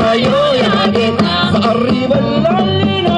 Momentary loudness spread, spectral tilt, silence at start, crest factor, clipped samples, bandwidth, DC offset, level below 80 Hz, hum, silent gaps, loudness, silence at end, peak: 2 LU; -6.5 dB/octave; 0 s; 10 dB; under 0.1%; 9.8 kHz; under 0.1%; -40 dBFS; none; none; -12 LUFS; 0 s; -2 dBFS